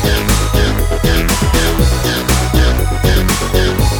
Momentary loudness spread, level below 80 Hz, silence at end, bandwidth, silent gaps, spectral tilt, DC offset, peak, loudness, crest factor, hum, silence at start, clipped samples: 2 LU; -16 dBFS; 0 s; 19 kHz; none; -4.5 dB/octave; under 0.1%; 0 dBFS; -13 LUFS; 12 dB; none; 0 s; under 0.1%